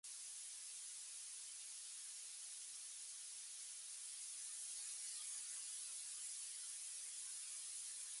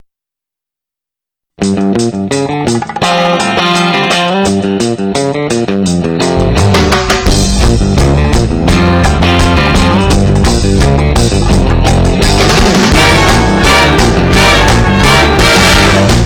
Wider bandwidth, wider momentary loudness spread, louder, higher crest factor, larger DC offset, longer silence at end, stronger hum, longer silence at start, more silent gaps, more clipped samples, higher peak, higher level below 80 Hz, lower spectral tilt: second, 16 kHz vs 19.5 kHz; second, 4 LU vs 7 LU; second, -49 LUFS vs -8 LUFS; first, 16 dB vs 6 dB; neither; about the same, 0 s vs 0 s; neither; second, 0.05 s vs 1.6 s; neither; neither; second, -36 dBFS vs -2 dBFS; second, under -90 dBFS vs -16 dBFS; second, 6.5 dB/octave vs -4.5 dB/octave